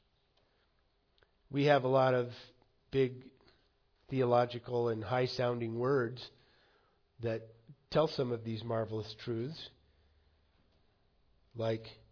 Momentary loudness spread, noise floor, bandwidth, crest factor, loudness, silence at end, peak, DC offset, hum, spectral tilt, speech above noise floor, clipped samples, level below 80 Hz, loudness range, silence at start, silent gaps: 14 LU; -74 dBFS; 5.4 kHz; 20 dB; -34 LUFS; 0.2 s; -16 dBFS; under 0.1%; none; -5.5 dB/octave; 41 dB; under 0.1%; -70 dBFS; 7 LU; 1.5 s; none